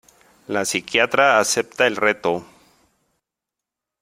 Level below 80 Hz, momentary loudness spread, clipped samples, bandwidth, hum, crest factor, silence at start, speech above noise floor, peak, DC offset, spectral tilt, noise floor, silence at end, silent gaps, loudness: -66 dBFS; 9 LU; under 0.1%; 16 kHz; none; 22 dB; 0.5 s; 66 dB; 0 dBFS; under 0.1%; -2 dB/octave; -85 dBFS; 1.6 s; none; -19 LUFS